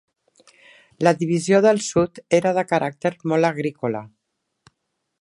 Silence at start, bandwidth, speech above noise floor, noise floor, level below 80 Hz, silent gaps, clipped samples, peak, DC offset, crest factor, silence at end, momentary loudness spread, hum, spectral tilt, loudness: 1 s; 11.5 kHz; 57 dB; -77 dBFS; -60 dBFS; none; under 0.1%; -2 dBFS; under 0.1%; 20 dB; 1.15 s; 9 LU; none; -5.5 dB/octave; -20 LUFS